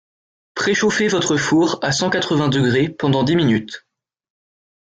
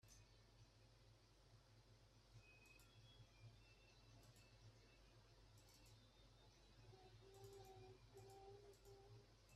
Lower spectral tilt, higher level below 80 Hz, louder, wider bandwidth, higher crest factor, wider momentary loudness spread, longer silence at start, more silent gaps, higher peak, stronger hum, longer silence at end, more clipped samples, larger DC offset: about the same, -4.5 dB/octave vs -4.5 dB/octave; first, -54 dBFS vs -76 dBFS; first, -17 LUFS vs -67 LUFS; second, 9.4 kHz vs 13.5 kHz; about the same, 14 dB vs 16 dB; about the same, 6 LU vs 5 LU; first, 0.55 s vs 0 s; neither; first, -4 dBFS vs -52 dBFS; neither; first, 1.2 s vs 0 s; neither; neither